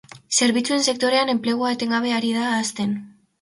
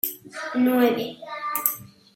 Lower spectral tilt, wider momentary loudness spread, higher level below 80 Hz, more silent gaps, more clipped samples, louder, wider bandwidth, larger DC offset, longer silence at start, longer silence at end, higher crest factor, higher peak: about the same, -2.5 dB/octave vs -3.5 dB/octave; second, 6 LU vs 14 LU; first, -66 dBFS vs -74 dBFS; neither; neither; first, -21 LUFS vs -24 LUFS; second, 11.5 kHz vs 17 kHz; neither; about the same, 0.15 s vs 0.05 s; about the same, 0.35 s vs 0.3 s; second, 16 dB vs 24 dB; second, -6 dBFS vs 0 dBFS